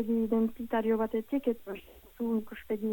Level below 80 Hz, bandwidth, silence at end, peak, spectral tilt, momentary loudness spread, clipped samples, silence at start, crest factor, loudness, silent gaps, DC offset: -60 dBFS; 17.5 kHz; 0 s; -16 dBFS; -8 dB/octave; 9 LU; under 0.1%; 0 s; 14 dB; -32 LUFS; none; under 0.1%